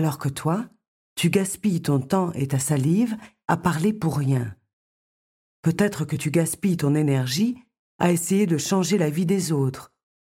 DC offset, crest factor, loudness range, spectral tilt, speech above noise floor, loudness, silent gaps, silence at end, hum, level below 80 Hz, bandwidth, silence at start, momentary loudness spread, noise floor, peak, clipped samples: under 0.1%; 18 dB; 3 LU; -6 dB/octave; over 68 dB; -23 LUFS; 0.88-1.16 s, 4.73-5.63 s, 7.79-7.99 s; 0.45 s; none; -58 dBFS; 16.5 kHz; 0 s; 6 LU; under -90 dBFS; -6 dBFS; under 0.1%